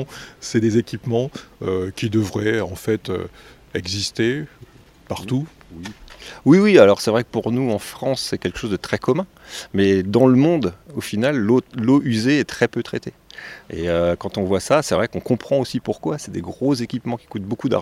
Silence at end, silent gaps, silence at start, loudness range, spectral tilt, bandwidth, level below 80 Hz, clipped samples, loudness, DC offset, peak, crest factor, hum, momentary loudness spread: 0 s; none; 0 s; 6 LU; -6 dB/octave; 15 kHz; -50 dBFS; under 0.1%; -20 LUFS; under 0.1%; 0 dBFS; 20 dB; none; 17 LU